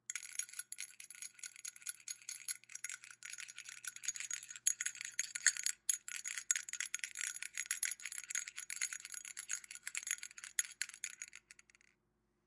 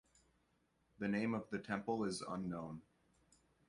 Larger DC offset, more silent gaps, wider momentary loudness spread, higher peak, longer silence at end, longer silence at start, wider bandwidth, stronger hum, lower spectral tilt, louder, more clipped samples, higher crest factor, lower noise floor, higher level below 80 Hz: neither; neither; first, 12 LU vs 8 LU; first, -14 dBFS vs -24 dBFS; about the same, 0.95 s vs 0.85 s; second, 0.1 s vs 1 s; about the same, 11.5 kHz vs 11 kHz; neither; second, 5 dB/octave vs -5.5 dB/octave; about the same, -41 LUFS vs -42 LUFS; neither; first, 30 dB vs 20 dB; about the same, -81 dBFS vs -79 dBFS; second, under -90 dBFS vs -74 dBFS